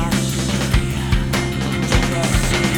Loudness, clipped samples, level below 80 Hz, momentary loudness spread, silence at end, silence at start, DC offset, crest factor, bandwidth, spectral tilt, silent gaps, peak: -19 LUFS; under 0.1%; -24 dBFS; 3 LU; 0 s; 0 s; under 0.1%; 16 dB; 19 kHz; -4.5 dB/octave; none; -2 dBFS